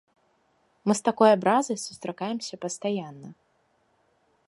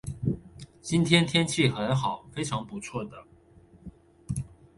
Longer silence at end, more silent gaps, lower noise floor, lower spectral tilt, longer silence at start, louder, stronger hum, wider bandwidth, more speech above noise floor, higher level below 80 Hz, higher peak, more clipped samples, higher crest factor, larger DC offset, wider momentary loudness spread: first, 1.15 s vs 0.3 s; neither; first, -69 dBFS vs -56 dBFS; about the same, -4.5 dB/octave vs -5 dB/octave; first, 0.85 s vs 0.05 s; about the same, -26 LUFS vs -28 LUFS; neither; about the same, 11.5 kHz vs 11.5 kHz; first, 43 dB vs 29 dB; second, -74 dBFS vs -52 dBFS; about the same, -6 dBFS vs -6 dBFS; neither; about the same, 22 dB vs 24 dB; neither; about the same, 14 LU vs 16 LU